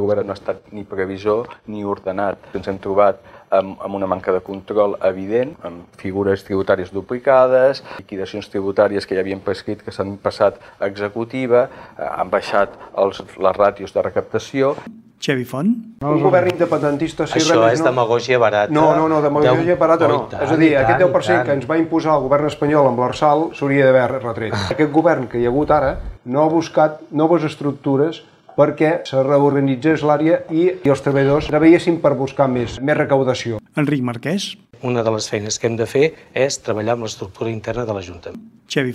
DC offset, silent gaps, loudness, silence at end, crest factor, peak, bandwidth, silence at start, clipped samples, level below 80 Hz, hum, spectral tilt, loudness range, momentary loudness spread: under 0.1%; none; -18 LUFS; 0 s; 16 dB; -2 dBFS; 12.5 kHz; 0 s; under 0.1%; -46 dBFS; none; -6 dB/octave; 6 LU; 12 LU